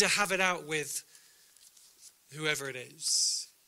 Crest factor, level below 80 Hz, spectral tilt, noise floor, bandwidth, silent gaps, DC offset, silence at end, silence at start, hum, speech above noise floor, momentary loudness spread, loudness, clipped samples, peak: 24 dB; -74 dBFS; -1 dB/octave; -60 dBFS; 16 kHz; none; under 0.1%; 0.2 s; 0 s; none; 29 dB; 12 LU; -30 LUFS; under 0.1%; -10 dBFS